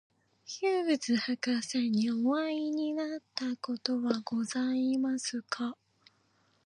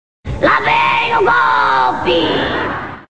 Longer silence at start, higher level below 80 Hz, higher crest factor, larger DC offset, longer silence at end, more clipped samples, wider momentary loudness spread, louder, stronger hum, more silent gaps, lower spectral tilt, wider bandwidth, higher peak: first, 0.45 s vs 0.2 s; second, -84 dBFS vs -36 dBFS; first, 20 dB vs 14 dB; second, under 0.1% vs 2%; first, 0.9 s vs 0 s; neither; about the same, 7 LU vs 7 LU; second, -32 LUFS vs -13 LUFS; neither; neither; second, -4 dB/octave vs -5.5 dB/octave; first, 11 kHz vs 9 kHz; second, -12 dBFS vs 0 dBFS